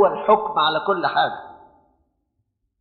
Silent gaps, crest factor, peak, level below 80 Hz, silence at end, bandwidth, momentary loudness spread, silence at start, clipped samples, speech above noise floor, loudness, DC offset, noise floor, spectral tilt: none; 18 dB; -4 dBFS; -62 dBFS; 1.25 s; 4.7 kHz; 7 LU; 0 s; under 0.1%; 54 dB; -20 LUFS; under 0.1%; -73 dBFS; -1 dB/octave